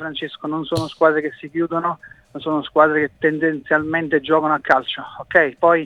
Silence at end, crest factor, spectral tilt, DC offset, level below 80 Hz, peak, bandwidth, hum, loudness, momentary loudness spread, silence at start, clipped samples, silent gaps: 0 s; 18 dB; -6 dB/octave; under 0.1%; -56 dBFS; 0 dBFS; 12 kHz; none; -19 LUFS; 12 LU; 0 s; under 0.1%; none